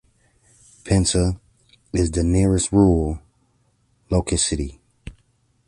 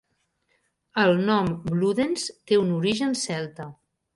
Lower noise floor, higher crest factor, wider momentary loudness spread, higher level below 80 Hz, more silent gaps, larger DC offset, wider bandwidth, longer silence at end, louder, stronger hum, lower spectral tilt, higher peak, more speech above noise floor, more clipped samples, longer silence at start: second, -63 dBFS vs -72 dBFS; about the same, 20 dB vs 18 dB; first, 18 LU vs 10 LU; first, -32 dBFS vs -58 dBFS; neither; neither; about the same, 11.5 kHz vs 11.5 kHz; about the same, 0.55 s vs 0.45 s; first, -20 LUFS vs -24 LUFS; neither; about the same, -5.5 dB/octave vs -5 dB/octave; about the same, -4 dBFS vs -6 dBFS; about the same, 45 dB vs 48 dB; neither; about the same, 0.85 s vs 0.95 s